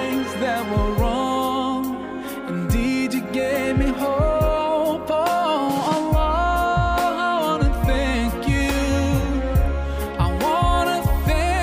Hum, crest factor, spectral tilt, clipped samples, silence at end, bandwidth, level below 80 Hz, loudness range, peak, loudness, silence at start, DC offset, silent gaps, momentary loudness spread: none; 12 dB; -6 dB/octave; under 0.1%; 0 s; 16 kHz; -26 dBFS; 2 LU; -8 dBFS; -21 LUFS; 0 s; under 0.1%; none; 4 LU